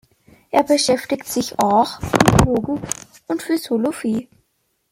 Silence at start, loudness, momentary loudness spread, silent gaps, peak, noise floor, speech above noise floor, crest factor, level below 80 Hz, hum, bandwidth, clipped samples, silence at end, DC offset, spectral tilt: 0.55 s; -19 LUFS; 12 LU; none; 0 dBFS; -68 dBFS; 50 dB; 20 dB; -38 dBFS; none; 16.5 kHz; under 0.1%; 0.7 s; under 0.1%; -5 dB/octave